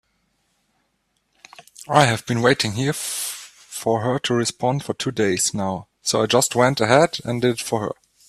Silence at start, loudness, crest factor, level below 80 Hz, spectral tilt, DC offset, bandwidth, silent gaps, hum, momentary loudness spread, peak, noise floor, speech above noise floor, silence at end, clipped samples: 1.8 s; -20 LUFS; 22 dB; -58 dBFS; -4 dB/octave; under 0.1%; 15.5 kHz; none; none; 10 LU; 0 dBFS; -70 dBFS; 50 dB; 0.35 s; under 0.1%